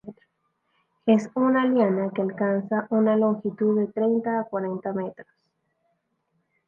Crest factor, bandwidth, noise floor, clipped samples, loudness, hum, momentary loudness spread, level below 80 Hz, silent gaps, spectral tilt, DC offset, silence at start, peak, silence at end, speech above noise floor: 18 dB; 7.2 kHz; -73 dBFS; under 0.1%; -24 LUFS; none; 9 LU; -74 dBFS; none; -8.5 dB/octave; under 0.1%; 0.05 s; -8 dBFS; 1.45 s; 50 dB